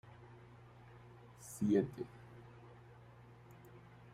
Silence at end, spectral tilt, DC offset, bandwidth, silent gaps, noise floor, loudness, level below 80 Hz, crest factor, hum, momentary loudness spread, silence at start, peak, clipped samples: 0.1 s; -7 dB/octave; under 0.1%; 16 kHz; none; -59 dBFS; -38 LUFS; -72 dBFS; 24 dB; 60 Hz at -60 dBFS; 25 LU; 0.05 s; -20 dBFS; under 0.1%